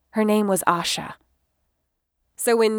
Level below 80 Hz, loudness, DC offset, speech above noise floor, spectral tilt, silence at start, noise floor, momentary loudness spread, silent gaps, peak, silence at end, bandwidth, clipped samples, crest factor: -64 dBFS; -22 LUFS; under 0.1%; 55 dB; -4 dB/octave; 0.15 s; -76 dBFS; 8 LU; none; -2 dBFS; 0 s; over 20 kHz; under 0.1%; 20 dB